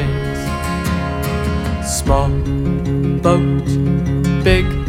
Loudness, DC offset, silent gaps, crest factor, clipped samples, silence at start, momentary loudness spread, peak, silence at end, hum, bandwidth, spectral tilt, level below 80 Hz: -17 LUFS; under 0.1%; none; 16 dB; under 0.1%; 0 s; 6 LU; 0 dBFS; 0 s; none; 16.5 kHz; -6 dB/octave; -24 dBFS